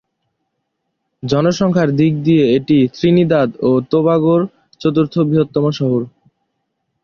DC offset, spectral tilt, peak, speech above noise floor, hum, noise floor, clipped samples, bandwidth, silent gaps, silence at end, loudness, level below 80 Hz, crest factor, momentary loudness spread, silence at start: under 0.1%; -8 dB/octave; -2 dBFS; 59 dB; none; -72 dBFS; under 0.1%; 7 kHz; none; 0.95 s; -15 LUFS; -52 dBFS; 14 dB; 6 LU; 1.25 s